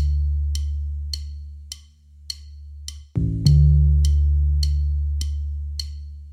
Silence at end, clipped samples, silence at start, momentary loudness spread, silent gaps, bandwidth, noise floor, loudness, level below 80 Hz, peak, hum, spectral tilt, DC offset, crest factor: 0 s; under 0.1%; 0 s; 21 LU; none; 10.5 kHz; -47 dBFS; -22 LUFS; -22 dBFS; -2 dBFS; none; -6.5 dB/octave; under 0.1%; 18 dB